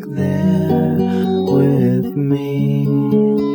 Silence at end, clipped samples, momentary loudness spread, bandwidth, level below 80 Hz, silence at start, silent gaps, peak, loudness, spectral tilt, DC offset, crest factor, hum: 0 s; under 0.1%; 4 LU; 20 kHz; -54 dBFS; 0 s; none; -2 dBFS; -16 LUFS; -9.5 dB/octave; under 0.1%; 12 dB; none